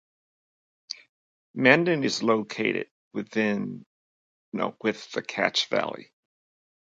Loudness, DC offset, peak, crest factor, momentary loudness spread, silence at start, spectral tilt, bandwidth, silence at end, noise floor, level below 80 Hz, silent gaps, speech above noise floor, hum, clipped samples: -25 LUFS; under 0.1%; -2 dBFS; 26 dB; 20 LU; 0.9 s; -4.5 dB/octave; 9.2 kHz; 0.8 s; under -90 dBFS; -74 dBFS; 1.09-1.54 s, 2.91-3.11 s, 3.86-4.52 s; over 64 dB; none; under 0.1%